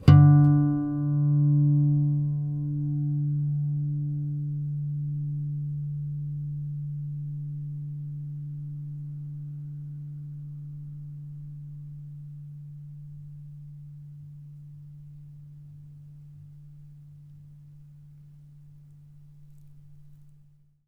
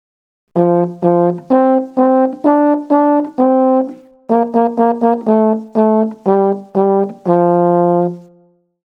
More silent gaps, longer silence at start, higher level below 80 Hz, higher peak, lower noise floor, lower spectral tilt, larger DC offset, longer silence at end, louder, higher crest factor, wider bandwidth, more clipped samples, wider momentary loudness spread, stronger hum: neither; second, 0 s vs 0.55 s; first, -54 dBFS vs -68 dBFS; second, -4 dBFS vs 0 dBFS; first, -58 dBFS vs -52 dBFS; about the same, -10.5 dB/octave vs -11 dB/octave; neither; about the same, 0.6 s vs 0.65 s; second, -27 LUFS vs -13 LUFS; first, 24 dB vs 14 dB; about the same, 5 kHz vs 5 kHz; neither; first, 25 LU vs 4 LU; neither